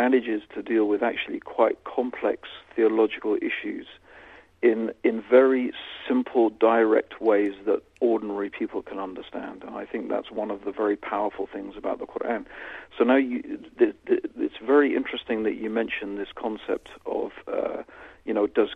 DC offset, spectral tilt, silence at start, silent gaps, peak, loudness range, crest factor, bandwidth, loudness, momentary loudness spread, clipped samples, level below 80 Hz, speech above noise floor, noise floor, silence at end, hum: under 0.1%; -7 dB/octave; 0 s; none; -4 dBFS; 8 LU; 20 dB; 4.6 kHz; -25 LUFS; 14 LU; under 0.1%; -62 dBFS; 24 dB; -50 dBFS; 0 s; none